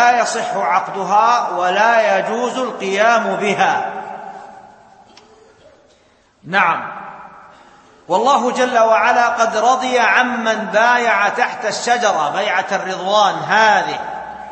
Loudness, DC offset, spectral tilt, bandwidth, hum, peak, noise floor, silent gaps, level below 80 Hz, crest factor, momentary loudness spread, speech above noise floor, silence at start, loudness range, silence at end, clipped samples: -15 LUFS; under 0.1%; -3 dB/octave; 8.8 kHz; none; 0 dBFS; -54 dBFS; none; -64 dBFS; 16 dB; 11 LU; 38 dB; 0 s; 9 LU; 0 s; under 0.1%